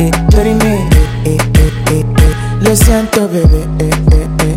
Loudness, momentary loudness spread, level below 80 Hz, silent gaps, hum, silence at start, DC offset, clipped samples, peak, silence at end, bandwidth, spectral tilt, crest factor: -10 LUFS; 4 LU; -12 dBFS; none; none; 0 s; under 0.1%; under 0.1%; 0 dBFS; 0 s; 16.5 kHz; -6 dB/octave; 8 dB